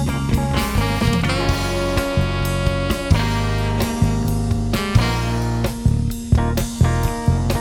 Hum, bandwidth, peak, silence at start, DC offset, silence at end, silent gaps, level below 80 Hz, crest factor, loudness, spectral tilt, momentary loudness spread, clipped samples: none; over 20 kHz; 0 dBFS; 0 s; under 0.1%; 0 s; none; -26 dBFS; 18 dB; -20 LUFS; -6 dB/octave; 3 LU; under 0.1%